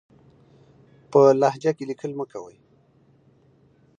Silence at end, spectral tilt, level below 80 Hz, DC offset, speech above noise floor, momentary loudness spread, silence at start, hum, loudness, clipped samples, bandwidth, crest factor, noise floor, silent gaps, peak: 1.55 s; -7 dB/octave; -72 dBFS; under 0.1%; 38 dB; 17 LU; 1.1 s; none; -21 LUFS; under 0.1%; 7.6 kHz; 20 dB; -59 dBFS; none; -4 dBFS